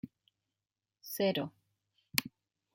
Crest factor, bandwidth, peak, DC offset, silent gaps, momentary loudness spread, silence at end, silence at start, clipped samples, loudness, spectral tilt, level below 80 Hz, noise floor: 36 dB; 16.5 kHz; -4 dBFS; under 0.1%; none; 20 LU; 0.45 s; 0.05 s; under 0.1%; -35 LUFS; -3.5 dB/octave; -76 dBFS; under -90 dBFS